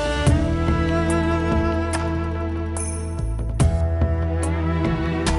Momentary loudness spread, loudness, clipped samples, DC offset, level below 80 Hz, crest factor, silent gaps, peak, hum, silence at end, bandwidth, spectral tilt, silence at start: 6 LU; -22 LUFS; under 0.1%; under 0.1%; -26 dBFS; 14 dB; none; -6 dBFS; none; 0 s; 11.5 kHz; -6 dB/octave; 0 s